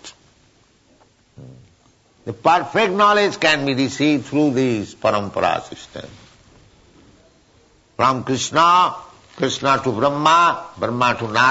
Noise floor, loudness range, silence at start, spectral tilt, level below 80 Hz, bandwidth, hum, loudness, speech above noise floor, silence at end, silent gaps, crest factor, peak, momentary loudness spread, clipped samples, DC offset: -56 dBFS; 8 LU; 0.05 s; -4.5 dB/octave; -56 dBFS; 8 kHz; none; -17 LUFS; 38 dB; 0 s; none; 16 dB; -4 dBFS; 16 LU; under 0.1%; under 0.1%